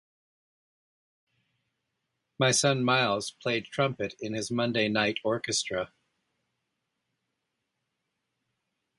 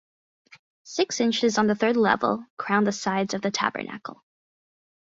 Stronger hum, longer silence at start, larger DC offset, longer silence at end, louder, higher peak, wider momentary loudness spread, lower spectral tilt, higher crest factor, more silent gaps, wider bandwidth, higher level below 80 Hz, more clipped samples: neither; first, 2.4 s vs 0.85 s; neither; first, 3.15 s vs 0.9 s; second, -28 LUFS vs -24 LUFS; second, -10 dBFS vs -6 dBFS; about the same, 10 LU vs 12 LU; about the same, -3.5 dB/octave vs -4 dB/octave; about the same, 22 dB vs 20 dB; second, none vs 2.50-2.57 s; first, 11.5 kHz vs 7.8 kHz; about the same, -68 dBFS vs -68 dBFS; neither